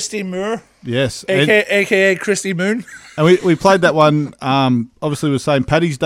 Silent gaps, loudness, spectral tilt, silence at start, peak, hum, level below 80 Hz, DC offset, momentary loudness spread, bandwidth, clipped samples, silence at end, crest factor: none; -15 LUFS; -5 dB/octave; 0 s; 0 dBFS; none; -48 dBFS; under 0.1%; 10 LU; 15.5 kHz; under 0.1%; 0 s; 14 dB